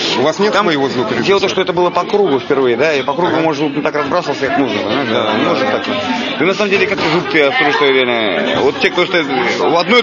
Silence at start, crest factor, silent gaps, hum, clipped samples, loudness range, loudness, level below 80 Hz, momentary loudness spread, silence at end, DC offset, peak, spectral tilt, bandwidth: 0 s; 14 dB; none; none; under 0.1%; 2 LU; -13 LUFS; -54 dBFS; 5 LU; 0 s; under 0.1%; 0 dBFS; -4.5 dB/octave; 7.4 kHz